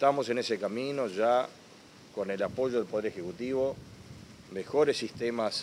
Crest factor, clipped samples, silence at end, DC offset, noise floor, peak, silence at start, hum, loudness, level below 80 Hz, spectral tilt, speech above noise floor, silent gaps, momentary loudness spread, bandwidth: 20 dB; under 0.1%; 0 s; under 0.1%; -53 dBFS; -12 dBFS; 0 s; none; -31 LUFS; -66 dBFS; -5 dB/octave; 23 dB; none; 16 LU; 15 kHz